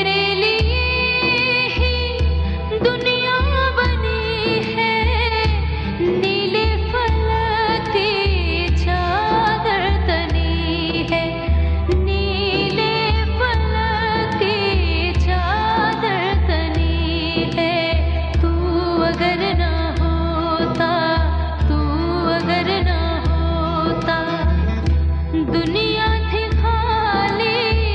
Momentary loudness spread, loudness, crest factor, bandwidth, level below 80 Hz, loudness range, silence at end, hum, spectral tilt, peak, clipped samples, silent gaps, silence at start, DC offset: 3 LU; -18 LUFS; 14 dB; 6.4 kHz; -22 dBFS; 1 LU; 0 s; none; -7 dB/octave; -4 dBFS; under 0.1%; none; 0 s; under 0.1%